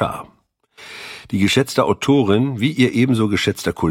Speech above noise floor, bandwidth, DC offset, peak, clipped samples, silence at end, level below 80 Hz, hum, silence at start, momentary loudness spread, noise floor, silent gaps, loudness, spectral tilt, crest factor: 40 dB; 16.5 kHz; under 0.1%; -2 dBFS; under 0.1%; 0 s; -48 dBFS; none; 0 s; 17 LU; -57 dBFS; none; -17 LUFS; -5.5 dB/octave; 16 dB